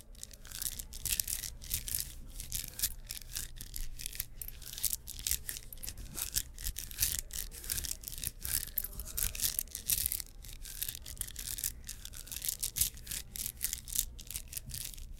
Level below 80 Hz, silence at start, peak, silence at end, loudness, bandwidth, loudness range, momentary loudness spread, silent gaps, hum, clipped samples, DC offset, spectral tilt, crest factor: -48 dBFS; 0 s; -6 dBFS; 0 s; -36 LUFS; 17 kHz; 4 LU; 12 LU; none; none; under 0.1%; under 0.1%; -0.5 dB/octave; 32 dB